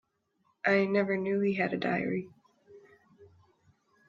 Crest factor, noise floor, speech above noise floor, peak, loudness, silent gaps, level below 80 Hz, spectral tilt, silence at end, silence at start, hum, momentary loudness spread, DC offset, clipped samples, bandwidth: 20 dB; -74 dBFS; 45 dB; -12 dBFS; -29 LUFS; none; -74 dBFS; -8 dB/octave; 0.85 s; 0.65 s; none; 9 LU; under 0.1%; under 0.1%; 7.2 kHz